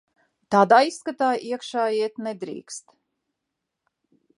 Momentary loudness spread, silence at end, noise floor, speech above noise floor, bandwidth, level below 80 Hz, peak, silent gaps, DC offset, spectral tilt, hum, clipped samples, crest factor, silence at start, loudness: 19 LU; 1.6 s; -82 dBFS; 60 dB; 11.5 kHz; -74 dBFS; -2 dBFS; none; under 0.1%; -4.5 dB/octave; none; under 0.1%; 22 dB; 0.5 s; -22 LUFS